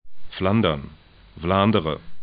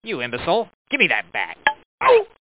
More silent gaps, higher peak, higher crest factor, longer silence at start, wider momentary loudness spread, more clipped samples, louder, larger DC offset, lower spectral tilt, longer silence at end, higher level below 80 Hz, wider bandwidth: second, none vs 0.75-0.85 s, 1.85-1.98 s; second, -4 dBFS vs 0 dBFS; about the same, 18 dB vs 20 dB; about the same, 0.05 s vs 0.05 s; first, 15 LU vs 9 LU; neither; about the same, -22 LUFS vs -20 LUFS; second, under 0.1% vs 0.1%; first, -11.5 dB/octave vs -7.5 dB/octave; second, 0 s vs 0.3 s; first, -44 dBFS vs -56 dBFS; first, 5 kHz vs 4 kHz